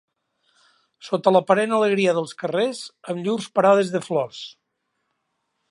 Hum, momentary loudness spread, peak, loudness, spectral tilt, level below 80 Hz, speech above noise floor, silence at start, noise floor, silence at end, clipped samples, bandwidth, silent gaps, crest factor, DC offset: none; 14 LU; -2 dBFS; -21 LUFS; -5.5 dB/octave; -76 dBFS; 55 dB; 1.05 s; -75 dBFS; 1.2 s; under 0.1%; 11.5 kHz; none; 20 dB; under 0.1%